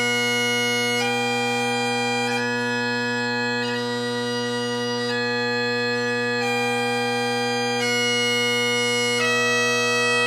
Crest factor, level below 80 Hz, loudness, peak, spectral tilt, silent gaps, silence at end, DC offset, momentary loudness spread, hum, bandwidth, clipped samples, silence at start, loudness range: 12 dB; -70 dBFS; -21 LUFS; -10 dBFS; -2.5 dB/octave; none; 0 s; under 0.1%; 5 LU; none; 15.5 kHz; under 0.1%; 0 s; 3 LU